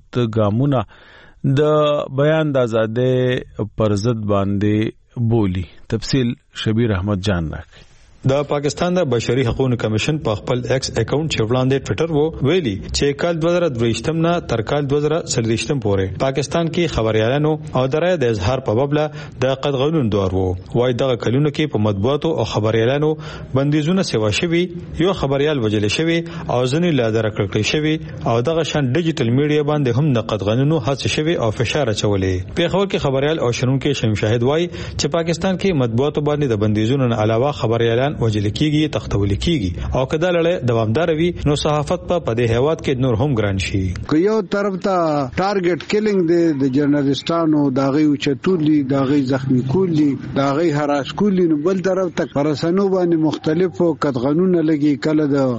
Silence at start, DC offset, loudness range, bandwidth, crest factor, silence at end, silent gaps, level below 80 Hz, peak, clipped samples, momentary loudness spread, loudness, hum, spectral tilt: 0.15 s; under 0.1%; 2 LU; 8.8 kHz; 12 dB; 0 s; none; -40 dBFS; -6 dBFS; under 0.1%; 4 LU; -18 LUFS; none; -6.5 dB/octave